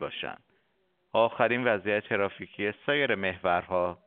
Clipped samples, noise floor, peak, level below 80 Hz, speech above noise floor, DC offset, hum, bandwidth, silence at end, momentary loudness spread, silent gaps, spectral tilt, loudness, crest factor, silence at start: under 0.1%; -73 dBFS; -8 dBFS; -66 dBFS; 45 dB; under 0.1%; none; 4.3 kHz; 0.1 s; 8 LU; none; -2.5 dB/octave; -28 LUFS; 22 dB; 0 s